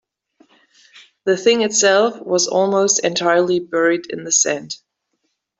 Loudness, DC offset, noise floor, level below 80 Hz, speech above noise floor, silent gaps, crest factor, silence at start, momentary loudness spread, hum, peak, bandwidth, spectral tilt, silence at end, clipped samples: -16 LUFS; under 0.1%; -72 dBFS; -66 dBFS; 55 dB; none; 16 dB; 0.95 s; 9 LU; none; -2 dBFS; 8.4 kHz; -2 dB/octave; 0.85 s; under 0.1%